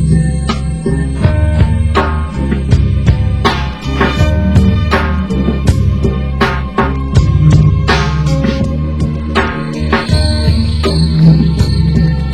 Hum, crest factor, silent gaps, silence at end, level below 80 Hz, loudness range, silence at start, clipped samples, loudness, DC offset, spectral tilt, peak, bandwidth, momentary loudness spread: none; 10 dB; none; 0 s; -16 dBFS; 1 LU; 0 s; 0.5%; -12 LUFS; 2%; -7 dB/octave; 0 dBFS; 11.5 kHz; 7 LU